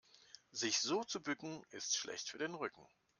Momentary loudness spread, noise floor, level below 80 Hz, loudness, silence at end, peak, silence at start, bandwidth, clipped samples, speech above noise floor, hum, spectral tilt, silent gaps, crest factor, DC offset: 13 LU; -64 dBFS; -86 dBFS; -40 LUFS; 0.35 s; -24 dBFS; 0.15 s; 11 kHz; under 0.1%; 22 dB; none; -1.5 dB/octave; none; 20 dB; under 0.1%